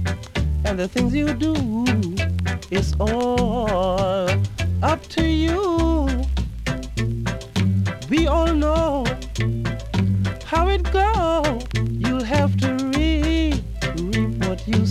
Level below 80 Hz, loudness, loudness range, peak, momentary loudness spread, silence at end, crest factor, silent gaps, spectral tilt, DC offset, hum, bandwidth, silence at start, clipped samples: -28 dBFS; -21 LUFS; 1 LU; -6 dBFS; 6 LU; 0 s; 14 dB; none; -6.5 dB/octave; under 0.1%; none; 13.5 kHz; 0 s; under 0.1%